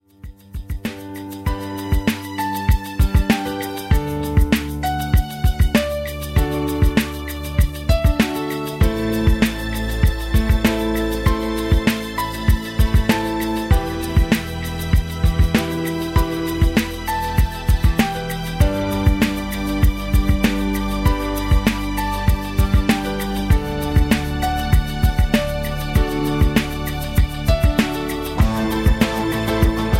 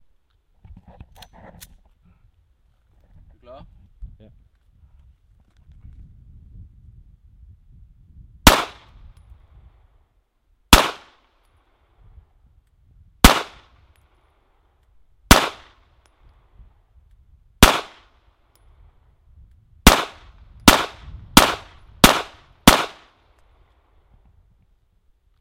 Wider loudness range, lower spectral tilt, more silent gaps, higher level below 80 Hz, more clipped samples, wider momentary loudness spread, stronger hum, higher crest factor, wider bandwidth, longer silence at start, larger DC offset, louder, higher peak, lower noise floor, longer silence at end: second, 1 LU vs 6 LU; first, -6 dB/octave vs -3 dB/octave; neither; first, -22 dBFS vs -30 dBFS; second, under 0.1% vs 0.1%; second, 7 LU vs 18 LU; neither; second, 16 dB vs 24 dB; about the same, 16.5 kHz vs 16 kHz; second, 0.25 s vs 4 s; neither; second, -20 LUFS vs -16 LUFS; about the same, -2 dBFS vs 0 dBFS; second, -39 dBFS vs -64 dBFS; second, 0 s vs 2.55 s